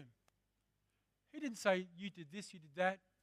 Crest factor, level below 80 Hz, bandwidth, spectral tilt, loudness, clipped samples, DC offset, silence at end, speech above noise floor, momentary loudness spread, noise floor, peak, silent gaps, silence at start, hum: 24 dB; -88 dBFS; 15.5 kHz; -4.5 dB/octave; -41 LUFS; under 0.1%; under 0.1%; 0.25 s; 43 dB; 14 LU; -84 dBFS; -18 dBFS; none; 0 s; none